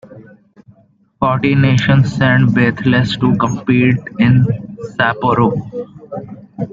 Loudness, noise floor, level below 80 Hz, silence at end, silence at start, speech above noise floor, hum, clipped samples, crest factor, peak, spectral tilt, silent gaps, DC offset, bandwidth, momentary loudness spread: -13 LUFS; -52 dBFS; -42 dBFS; 0 s; 0.1 s; 39 dB; none; under 0.1%; 14 dB; -2 dBFS; -7.5 dB/octave; none; under 0.1%; 7.6 kHz; 16 LU